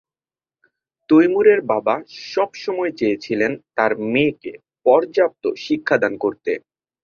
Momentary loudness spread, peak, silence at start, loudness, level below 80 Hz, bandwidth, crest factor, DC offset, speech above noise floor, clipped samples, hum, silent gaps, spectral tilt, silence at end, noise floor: 11 LU; -2 dBFS; 1.1 s; -19 LUFS; -64 dBFS; 7 kHz; 18 dB; under 0.1%; over 72 dB; under 0.1%; none; none; -6.5 dB/octave; 0.45 s; under -90 dBFS